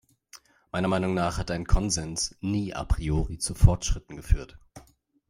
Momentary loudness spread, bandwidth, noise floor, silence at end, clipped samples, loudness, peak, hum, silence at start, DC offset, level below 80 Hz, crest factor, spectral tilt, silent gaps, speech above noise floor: 9 LU; 16 kHz; -54 dBFS; 0.5 s; under 0.1%; -28 LUFS; -4 dBFS; none; 0.35 s; under 0.1%; -32 dBFS; 22 dB; -5 dB/octave; none; 29 dB